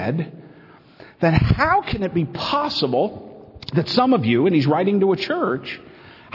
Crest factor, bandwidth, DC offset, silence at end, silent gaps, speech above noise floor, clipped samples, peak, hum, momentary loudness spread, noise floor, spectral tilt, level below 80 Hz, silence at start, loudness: 18 dB; 6 kHz; under 0.1%; 0.55 s; none; 28 dB; under 0.1%; -2 dBFS; none; 10 LU; -47 dBFS; -7.5 dB/octave; -40 dBFS; 0 s; -20 LUFS